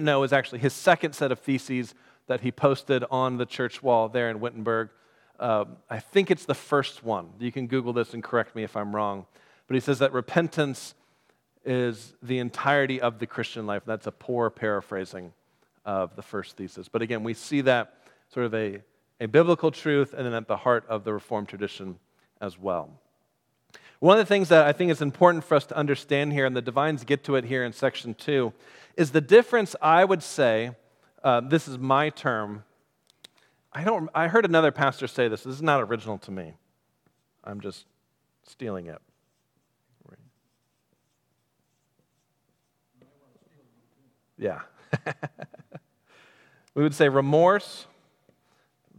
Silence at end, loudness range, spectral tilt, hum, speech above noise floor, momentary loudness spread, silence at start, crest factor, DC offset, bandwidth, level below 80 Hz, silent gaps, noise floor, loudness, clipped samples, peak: 1.15 s; 15 LU; -6 dB/octave; none; 49 dB; 18 LU; 0 s; 24 dB; under 0.1%; 15 kHz; -76 dBFS; none; -74 dBFS; -25 LUFS; under 0.1%; -2 dBFS